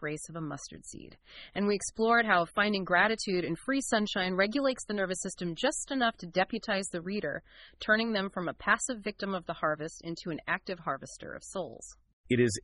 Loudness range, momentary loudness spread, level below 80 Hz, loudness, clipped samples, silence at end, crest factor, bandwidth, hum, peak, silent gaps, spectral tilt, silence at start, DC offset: 6 LU; 16 LU; -60 dBFS; -31 LUFS; under 0.1%; 0.05 s; 22 dB; 11.5 kHz; none; -10 dBFS; 12.13-12.24 s; -4 dB/octave; 0 s; under 0.1%